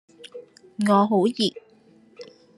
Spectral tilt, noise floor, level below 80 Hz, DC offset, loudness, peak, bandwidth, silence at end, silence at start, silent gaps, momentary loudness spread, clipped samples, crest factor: -6 dB/octave; -55 dBFS; -74 dBFS; under 0.1%; -21 LUFS; -6 dBFS; 12 kHz; 0.35 s; 0.35 s; none; 24 LU; under 0.1%; 20 dB